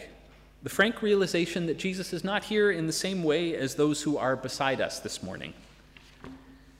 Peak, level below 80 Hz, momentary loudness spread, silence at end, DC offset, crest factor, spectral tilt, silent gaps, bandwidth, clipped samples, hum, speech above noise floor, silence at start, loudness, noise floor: -10 dBFS; -58 dBFS; 18 LU; 0.25 s; under 0.1%; 20 dB; -4.5 dB/octave; none; 16 kHz; under 0.1%; none; 26 dB; 0 s; -28 LUFS; -54 dBFS